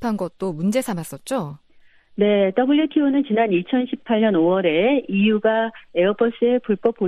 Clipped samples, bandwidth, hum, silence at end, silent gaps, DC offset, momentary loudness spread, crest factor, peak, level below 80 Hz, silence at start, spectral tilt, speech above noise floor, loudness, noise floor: under 0.1%; 14 kHz; none; 0 s; none; under 0.1%; 9 LU; 16 dB; -4 dBFS; -60 dBFS; 0 s; -6.5 dB/octave; 32 dB; -20 LUFS; -51 dBFS